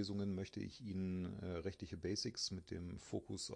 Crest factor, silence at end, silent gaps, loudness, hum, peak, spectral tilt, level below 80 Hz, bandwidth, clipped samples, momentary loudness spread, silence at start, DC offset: 16 dB; 0 s; none; -45 LUFS; none; -28 dBFS; -5 dB/octave; -66 dBFS; 10.5 kHz; under 0.1%; 6 LU; 0 s; under 0.1%